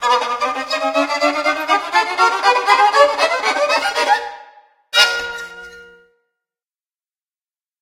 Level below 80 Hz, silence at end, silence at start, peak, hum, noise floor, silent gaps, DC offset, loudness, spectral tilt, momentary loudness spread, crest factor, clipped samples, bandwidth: -60 dBFS; 1.95 s; 0 s; 0 dBFS; none; under -90 dBFS; none; under 0.1%; -15 LUFS; 0 dB/octave; 10 LU; 18 dB; under 0.1%; 16.5 kHz